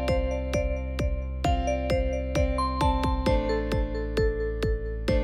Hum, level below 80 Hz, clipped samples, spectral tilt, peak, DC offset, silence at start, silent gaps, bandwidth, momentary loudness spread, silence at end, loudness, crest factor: none; -30 dBFS; under 0.1%; -6.5 dB/octave; -12 dBFS; under 0.1%; 0 s; none; 12.5 kHz; 5 LU; 0 s; -28 LUFS; 14 dB